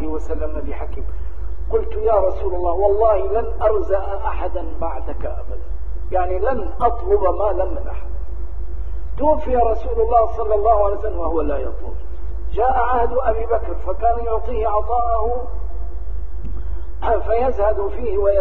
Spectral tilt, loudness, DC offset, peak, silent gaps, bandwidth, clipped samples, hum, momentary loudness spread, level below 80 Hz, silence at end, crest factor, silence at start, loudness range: -9.5 dB/octave; -21 LUFS; 10%; -2 dBFS; none; 4.1 kHz; under 0.1%; none; 14 LU; -26 dBFS; 0 s; 16 dB; 0 s; 4 LU